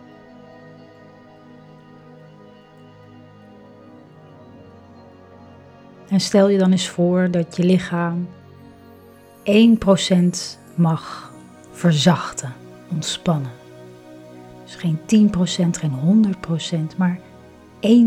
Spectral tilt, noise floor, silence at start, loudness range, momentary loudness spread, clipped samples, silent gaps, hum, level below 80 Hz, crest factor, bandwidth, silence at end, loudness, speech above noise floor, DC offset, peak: -6 dB/octave; -46 dBFS; 6.1 s; 4 LU; 20 LU; under 0.1%; none; none; -54 dBFS; 20 dB; 12 kHz; 0 s; -19 LUFS; 28 dB; under 0.1%; -2 dBFS